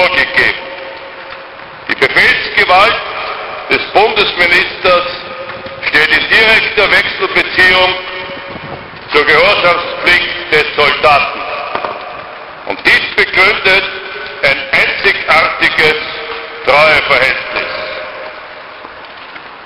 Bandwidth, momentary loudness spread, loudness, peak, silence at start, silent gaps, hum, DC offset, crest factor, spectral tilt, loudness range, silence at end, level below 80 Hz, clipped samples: 16 kHz; 20 LU; -9 LUFS; 0 dBFS; 0 s; none; none; under 0.1%; 12 dB; -3.5 dB/octave; 3 LU; 0 s; -40 dBFS; 0.2%